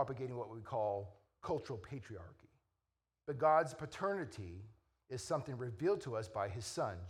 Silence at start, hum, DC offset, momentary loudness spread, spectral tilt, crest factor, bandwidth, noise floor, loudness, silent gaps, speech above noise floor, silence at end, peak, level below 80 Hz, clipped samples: 0 s; none; under 0.1%; 18 LU; -5.5 dB/octave; 20 dB; 14.5 kHz; -90 dBFS; -40 LUFS; none; 50 dB; 0 s; -20 dBFS; -72 dBFS; under 0.1%